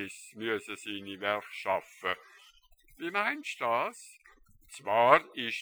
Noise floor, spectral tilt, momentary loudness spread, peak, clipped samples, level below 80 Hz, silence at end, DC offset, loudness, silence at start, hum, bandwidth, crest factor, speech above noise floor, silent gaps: -61 dBFS; -3.5 dB/octave; 17 LU; -4 dBFS; under 0.1%; -70 dBFS; 0 s; under 0.1%; -31 LUFS; 0 s; none; over 20 kHz; 28 dB; 29 dB; none